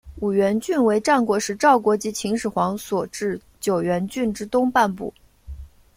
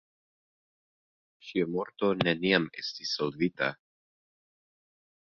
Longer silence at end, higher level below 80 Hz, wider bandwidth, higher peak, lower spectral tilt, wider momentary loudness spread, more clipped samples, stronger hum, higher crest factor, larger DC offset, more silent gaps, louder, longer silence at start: second, 0.3 s vs 1.55 s; first, -48 dBFS vs -70 dBFS; first, 16.5 kHz vs 7.2 kHz; about the same, -4 dBFS vs -6 dBFS; about the same, -5 dB/octave vs -5.5 dB/octave; about the same, 10 LU vs 9 LU; neither; neither; second, 18 dB vs 28 dB; neither; neither; first, -21 LUFS vs -30 LUFS; second, 0.05 s vs 1.45 s